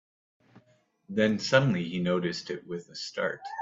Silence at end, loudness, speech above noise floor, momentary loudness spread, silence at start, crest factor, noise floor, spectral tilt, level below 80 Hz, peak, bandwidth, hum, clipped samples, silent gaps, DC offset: 0 s; -29 LUFS; 37 dB; 13 LU; 1.1 s; 24 dB; -65 dBFS; -5.5 dB/octave; -68 dBFS; -6 dBFS; 7.8 kHz; none; under 0.1%; none; under 0.1%